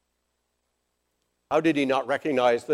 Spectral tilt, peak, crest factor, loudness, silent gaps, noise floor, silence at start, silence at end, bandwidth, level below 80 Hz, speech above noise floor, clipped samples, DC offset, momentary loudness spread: -5.5 dB/octave; -8 dBFS; 18 dB; -24 LUFS; none; -77 dBFS; 1.5 s; 0 s; 12.5 kHz; -70 dBFS; 53 dB; under 0.1%; under 0.1%; 3 LU